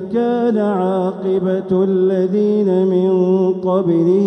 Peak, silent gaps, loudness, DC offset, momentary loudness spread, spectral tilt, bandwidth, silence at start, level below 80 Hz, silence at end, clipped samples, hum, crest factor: -4 dBFS; none; -16 LUFS; under 0.1%; 4 LU; -10 dB/octave; 6 kHz; 0 s; -60 dBFS; 0 s; under 0.1%; none; 10 dB